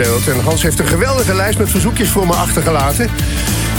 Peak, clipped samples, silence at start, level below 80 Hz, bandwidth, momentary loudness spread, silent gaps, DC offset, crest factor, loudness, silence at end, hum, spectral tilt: -2 dBFS; under 0.1%; 0 s; -22 dBFS; 17.5 kHz; 3 LU; none; under 0.1%; 12 dB; -13 LUFS; 0 s; none; -4.5 dB/octave